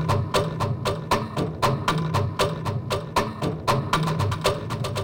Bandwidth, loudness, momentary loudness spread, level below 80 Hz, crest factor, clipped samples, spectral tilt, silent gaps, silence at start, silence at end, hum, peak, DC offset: 17 kHz; -25 LUFS; 5 LU; -42 dBFS; 18 dB; under 0.1%; -5.5 dB/octave; none; 0 s; 0 s; none; -6 dBFS; under 0.1%